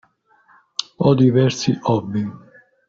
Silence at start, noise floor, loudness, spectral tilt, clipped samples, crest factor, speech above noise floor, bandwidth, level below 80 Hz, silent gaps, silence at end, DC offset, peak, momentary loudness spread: 0.8 s; -56 dBFS; -19 LUFS; -6.5 dB/octave; under 0.1%; 18 dB; 40 dB; 7.6 kHz; -56 dBFS; none; 0.5 s; under 0.1%; -2 dBFS; 14 LU